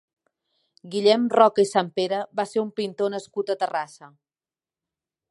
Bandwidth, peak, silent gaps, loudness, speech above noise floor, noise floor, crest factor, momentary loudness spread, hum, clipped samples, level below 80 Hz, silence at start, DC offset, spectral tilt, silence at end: 11.5 kHz; -2 dBFS; none; -23 LUFS; over 67 dB; under -90 dBFS; 22 dB; 12 LU; none; under 0.1%; -78 dBFS; 0.85 s; under 0.1%; -4.5 dB/octave; 1.25 s